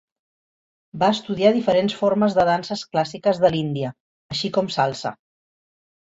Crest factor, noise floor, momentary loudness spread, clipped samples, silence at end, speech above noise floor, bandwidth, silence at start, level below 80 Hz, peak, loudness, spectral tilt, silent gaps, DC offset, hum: 18 dB; under -90 dBFS; 11 LU; under 0.1%; 1 s; over 70 dB; 8 kHz; 0.95 s; -58 dBFS; -4 dBFS; -21 LUFS; -6 dB/octave; 4.00-4.29 s; under 0.1%; none